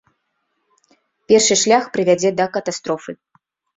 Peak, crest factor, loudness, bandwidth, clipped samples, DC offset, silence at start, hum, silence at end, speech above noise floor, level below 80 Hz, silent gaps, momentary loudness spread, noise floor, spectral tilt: 0 dBFS; 18 dB; -16 LUFS; 8.4 kHz; under 0.1%; under 0.1%; 1.3 s; none; 0.6 s; 54 dB; -62 dBFS; none; 13 LU; -71 dBFS; -3 dB/octave